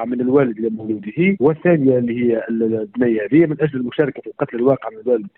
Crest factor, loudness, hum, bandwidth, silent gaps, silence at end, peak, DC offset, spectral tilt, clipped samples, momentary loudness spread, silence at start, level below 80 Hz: 14 dB; -18 LUFS; none; 4 kHz; none; 0.1 s; -4 dBFS; under 0.1%; -11.5 dB/octave; under 0.1%; 8 LU; 0 s; -58 dBFS